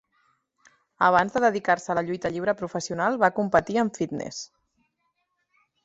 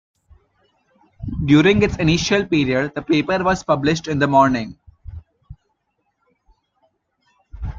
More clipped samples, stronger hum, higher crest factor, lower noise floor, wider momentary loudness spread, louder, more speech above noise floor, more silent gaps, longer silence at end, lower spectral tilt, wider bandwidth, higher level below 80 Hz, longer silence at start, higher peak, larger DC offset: neither; neither; about the same, 22 dB vs 18 dB; first, -75 dBFS vs -71 dBFS; second, 11 LU vs 20 LU; second, -24 LUFS vs -17 LUFS; about the same, 51 dB vs 54 dB; neither; first, 1.4 s vs 0 s; about the same, -5 dB/octave vs -6 dB/octave; about the same, 8.2 kHz vs 7.6 kHz; second, -60 dBFS vs -40 dBFS; second, 1 s vs 1.2 s; about the same, -4 dBFS vs -2 dBFS; neither